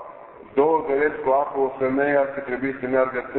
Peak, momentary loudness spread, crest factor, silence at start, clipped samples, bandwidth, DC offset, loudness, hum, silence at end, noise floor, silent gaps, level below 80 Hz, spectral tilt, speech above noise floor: -6 dBFS; 7 LU; 16 dB; 0 s; under 0.1%; 4.2 kHz; under 0.1%; -22 LUFS; none; 0 s; -42 dBFS; none; -58 dBFS; -11 dB/octave; 20 dB